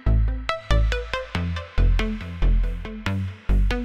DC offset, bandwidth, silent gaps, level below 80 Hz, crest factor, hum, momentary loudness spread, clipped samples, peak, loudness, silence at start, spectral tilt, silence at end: 0.3%; 8.2 kHz; none; -22 dBFS; 16 dB; none; 6 LU; under 0.1%; -6 dBFS; -26 LUFS; 0 s; -6.5 dB/octave; 0 s